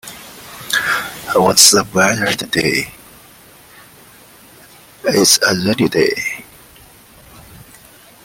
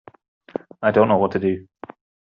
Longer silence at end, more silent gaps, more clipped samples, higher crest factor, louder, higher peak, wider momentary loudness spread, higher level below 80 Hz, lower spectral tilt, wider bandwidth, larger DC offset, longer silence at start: about the same, 0.7 s vs 0.6 s; neither; neither; about the same, 18 dB vs 18 dB; first, -13 LUFS vs -20 LUFS; first, 0 dBFS vs -4 dBFS; second, 22 LU vs 25 LU; first, -52 dBFS vs -62 dBFS; second, -2 dB/octave vs -6 dB/octave; first, 17 kHz vs 5.6 kHz; neither; second, 0.05 s vs 0.8 s